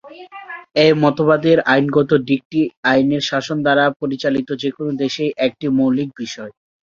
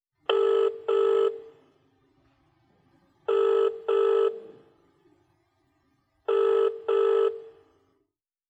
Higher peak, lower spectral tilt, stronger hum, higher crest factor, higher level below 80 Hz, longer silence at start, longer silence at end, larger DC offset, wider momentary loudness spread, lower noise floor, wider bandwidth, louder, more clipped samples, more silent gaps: first, -2 dBFS vs -8 dBFS; first, -6 dB/octave vs -4.5 dB/octave; neither; about the same, 16 dB vs 18 dB; first, -58 dBFS vs -80 dBFS; second, 0.05 s vs 0.3 s; second, 0.35 s vs 1 s; neither; first, 15 LU vs 12 LU; second, -36 dBFS vs -79 dBFS; about the same, 7.4 kHz vs 8 kHz; first, -17 LUFS vs -25 LUFS; neither; first, 2.45-2.50 s, 2.77-2.83 s, 3.96-4.00 s vs none